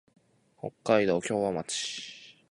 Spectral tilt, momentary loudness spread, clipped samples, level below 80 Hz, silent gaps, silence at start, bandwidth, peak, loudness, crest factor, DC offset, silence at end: -4 dB/octave; 17 LU; under 0.1%; -66 dBFS; none; 0.65 s; 11.5 kHz; -10 dBFS; -29 LUFS; 22 dB; under 0.1%; 0.2 s